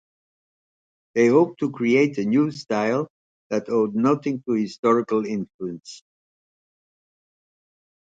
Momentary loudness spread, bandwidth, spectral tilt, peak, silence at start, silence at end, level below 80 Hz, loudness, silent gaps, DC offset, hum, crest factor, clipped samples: 14 LU; 8 kHz; -6.5 dB/octave; -6 dBFS; 1.15 s; 2.1 s; -70 dBFS; -22 LUFS; 3.10-3.50 s, 4.79-4.83 s, 5.54-5.59 s; under 0.1%; none; 18 dB; under 0.1%